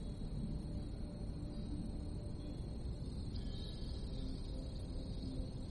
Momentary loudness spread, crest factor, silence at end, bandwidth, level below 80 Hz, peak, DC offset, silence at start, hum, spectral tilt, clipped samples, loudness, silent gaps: 2 LU; 12 dB; 0 s; 11.5 kHz; -46 dBFS; -30 dBFS; under 0.1%; 0 s; none; -7.5 dB/octave; under 0.1%; -46 LUFS; none